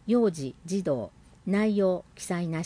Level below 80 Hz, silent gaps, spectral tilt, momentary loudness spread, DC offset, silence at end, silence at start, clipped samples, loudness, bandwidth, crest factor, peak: -60 dBFS; none; -6.5 dB/octave; 11 LU; under 0.1%; 0 s; 0.05 s; under 0.1%; -28 LUFS; 10.5 kHz; 14 dB; -14 dBFS